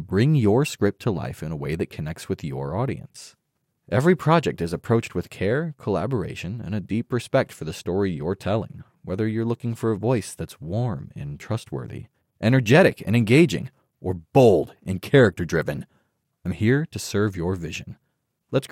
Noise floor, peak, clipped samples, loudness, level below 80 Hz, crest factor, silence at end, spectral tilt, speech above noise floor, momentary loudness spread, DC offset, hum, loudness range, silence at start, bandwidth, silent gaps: -72 dBFS; -4 dBFS; under 0.1%; -23 LUFS; -52 dBFS; 20 dB; 0.05 s; -7 dB/octave; 50 dB; 16 LU; under 0.1%; none; 7 LU; 0 s; 16 kHz; none